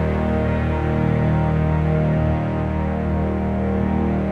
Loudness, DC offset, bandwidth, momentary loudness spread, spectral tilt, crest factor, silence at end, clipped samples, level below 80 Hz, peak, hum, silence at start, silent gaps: -20 LUFS; under 0.1%; 5 kHz; 3 LU; -10 dB/octave; 12 dB; 0 s; under 0.1%; -28 dBFS; -8 dBFS; none; 0 s; none